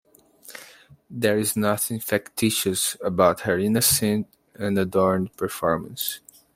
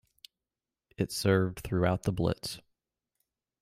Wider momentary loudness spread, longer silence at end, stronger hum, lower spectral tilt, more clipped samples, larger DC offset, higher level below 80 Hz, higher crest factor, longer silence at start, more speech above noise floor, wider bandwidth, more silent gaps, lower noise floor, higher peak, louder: first, 19 LU vs 11 LU; second, 0.35 s vs 1 s; neither; second, -4 dB/octave vs -6 dB/octave; neither; neither; about the same, -58 dBFS vs -54 dBFS; about the same, 20 dB vs 20 dB; second, 0.45 s vs 1 s; second, 27 dB vs over 61 dB; about the same, 16.5 kHz vs 16 kHz; neither; second, -50 dBFS vs under -90 dBFS; first, -4 dBFS vs -12 dBFS; first, -23 LUFS vs -31 LUFS